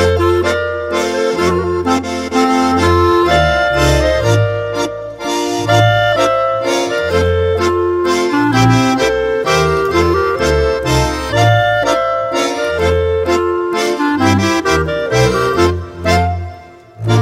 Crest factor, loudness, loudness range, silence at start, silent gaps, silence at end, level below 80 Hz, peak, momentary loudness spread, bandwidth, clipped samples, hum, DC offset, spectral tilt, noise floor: 12 dB; -13 LUFS; 1 LU; 0 s; none; 0 s; -28 dBFS; 0 dBFS; 6 LU; 16 kHz; under 0.1%; none; under 0.1%; -5.5 dB/octave; -35 dBFS